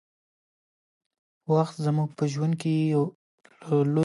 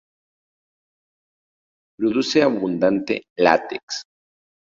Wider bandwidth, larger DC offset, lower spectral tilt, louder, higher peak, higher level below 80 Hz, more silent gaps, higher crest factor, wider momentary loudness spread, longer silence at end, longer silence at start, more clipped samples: first, 11.5 kHz vs 7.8 kHz; neither; first, -8 dB/octave vs -4.5 dB/octave; second, -26 LUFS vs -20 LUFS; second, -10 dBFS vs -2 dBFS; second, -76 dBFS vs -64 dBFS; first, 3.15-3.38 s vs 3.30-3.36 s, 3.83-3.88 s; about the same, 18 dB vs 22 dB; second, 7 LU vs 11 LU; second, 0 s vs 0.7 s; second, 1.5 s vs 2 s; neither